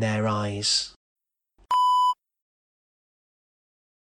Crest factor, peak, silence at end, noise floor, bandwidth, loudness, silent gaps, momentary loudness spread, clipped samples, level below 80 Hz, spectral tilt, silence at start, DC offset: 16 dB; -12 dBFS; 2.05 s; -63 dBFS; 16 kHz; -23 LUFS; 0.96-1.16 s; 9 LU; under 0.1%; -64 dBFS; -3.5 dB/octave; 0 s; under 0.1%